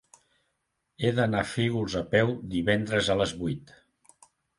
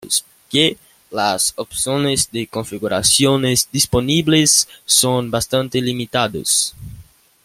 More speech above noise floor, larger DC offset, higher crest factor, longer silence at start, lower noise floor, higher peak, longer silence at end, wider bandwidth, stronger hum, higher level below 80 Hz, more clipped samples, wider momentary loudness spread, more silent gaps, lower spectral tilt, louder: first, 52 dB vs 26 dB; neither; about the same, 22 dB vs 18 dB; first, 1 s vs 0 s; first, -78 dBFS vs -43 dBFS; second, -8 dBFS vs 0 dBFS; first, 0.95 s vs 0.4 s; second, 11.5 kHz vs 16.5 kHz; neither; second, -52 dBFS vs -46 dBFS; neither; about the same, 6 LU vs 8 LU; neither; first, -5.5 dB/octave vs -3 dB/octave; second, -27 LUFS vs -16 LUFS